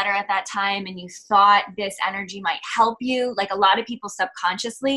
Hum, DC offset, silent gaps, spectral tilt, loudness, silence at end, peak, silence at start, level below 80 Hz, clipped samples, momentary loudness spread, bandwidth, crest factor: none; under 0.1%; none; -2.5 dB/octave; -21 LUFS; 0 s; -4 dBFS; 0 s; -66 dBFS; under 0.1%; 11 LU; 12.5 kHz; 18 dB